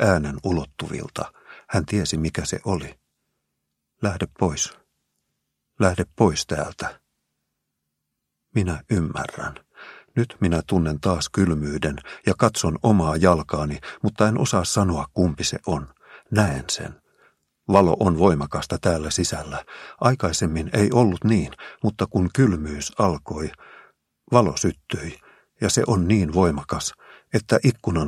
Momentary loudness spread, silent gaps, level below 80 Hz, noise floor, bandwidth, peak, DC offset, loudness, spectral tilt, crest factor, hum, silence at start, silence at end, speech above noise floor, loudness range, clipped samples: 12 LU; none; -42 dBFS; -79 dBFS; 14 kHz; 0 dBFS; under 0.1%; -22 LUFS; -5.5 dB/octave; 22 dB; none; 0 s; 0 s; 58 dB; 6 LU; under 0.1%